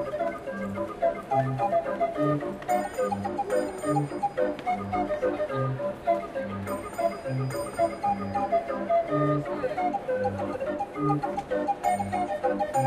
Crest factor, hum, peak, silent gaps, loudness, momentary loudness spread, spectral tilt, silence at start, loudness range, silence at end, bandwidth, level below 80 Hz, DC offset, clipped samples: 16 dB; none; -12 dBFS; none; -28 LUFS; 5 LU; -7 dB/octave; 0 s; 2 LU; 0 s; 14.5 kHz; -56 dBFS; under 0.1%; under 0.1%